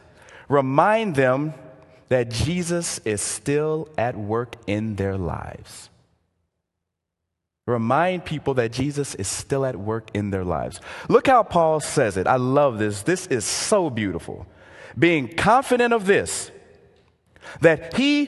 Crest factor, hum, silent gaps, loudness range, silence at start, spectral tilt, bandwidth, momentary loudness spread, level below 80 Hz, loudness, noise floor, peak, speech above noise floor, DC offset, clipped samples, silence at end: 20 dB; none; none; 7 LU; 0.3 s; -5 dB/octave; 12.5 kHz; 13 LU; -46 dBFS; -22 LUFS; -81 dBFS; -2 dBFS; 60 dB; under 0.1%; under 0.1%; 0 s